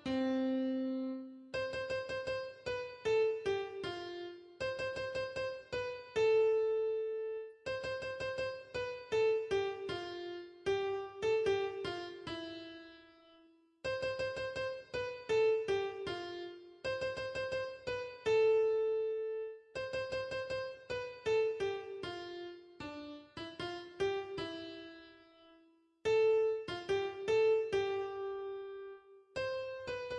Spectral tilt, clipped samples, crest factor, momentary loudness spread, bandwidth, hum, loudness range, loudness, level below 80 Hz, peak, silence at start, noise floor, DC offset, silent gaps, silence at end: -5 dB/octave; under 0.1%; 14 dB; 15 LU; 9.8 kHz; none; 5 LU; -37 LUFS; -68 dBFS; -22 dBFS; 0 s; -68 dBFS; under 0.1%; none; 0 s